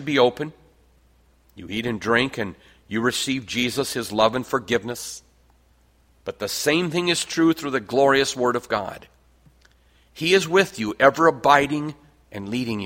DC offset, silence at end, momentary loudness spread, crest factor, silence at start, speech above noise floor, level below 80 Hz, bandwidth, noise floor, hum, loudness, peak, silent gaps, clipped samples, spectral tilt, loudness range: under 0.1%; 0 s; 16 LU; 22 dB; 0 s; 37 dB; -56 dBFS; 16.5 kHz; -59 dBFS; none; -21 LUFS; 0 dBFS; none; under 0.1%; -4 dB/octave; 5 LU